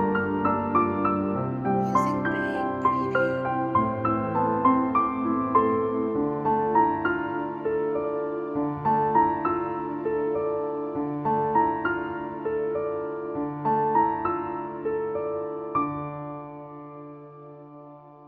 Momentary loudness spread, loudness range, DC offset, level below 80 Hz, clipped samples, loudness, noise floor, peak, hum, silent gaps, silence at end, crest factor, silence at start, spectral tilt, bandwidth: 11 LU; 4 LU; under 0.1%; -56 dBFS; under 0.1%; -26 LUFS; -46 dBFS; -8 dBFS; none; none; 0 s; 18 dB; 0 s; -8.5 dB/octave; 7.4 kHz